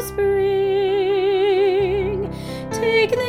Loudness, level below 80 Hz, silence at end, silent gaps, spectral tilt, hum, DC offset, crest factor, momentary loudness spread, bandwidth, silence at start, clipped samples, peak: -19 LUFS; -42 dBFS; 0 s; none; -5.5 dB/octave; none; under 0.1%; 12 dB; 9 LU; 15.5 kHz; 0 s; under 0.1%; -8 dBFS